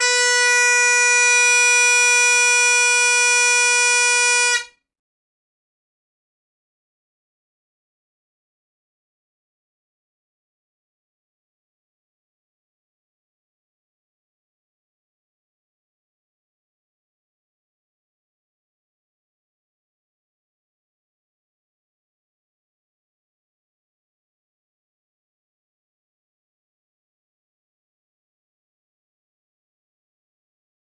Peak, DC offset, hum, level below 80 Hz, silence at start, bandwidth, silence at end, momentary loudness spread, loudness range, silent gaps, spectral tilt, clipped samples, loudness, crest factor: -6 dBFS; under 0.1%; none; -82 dBFS; 0 s; 11.5 kHz; 26.35 s; 2 LU; 9 LU; none; 6.5 dB/octave; under 0.1%; -13 LUFS; 18 dB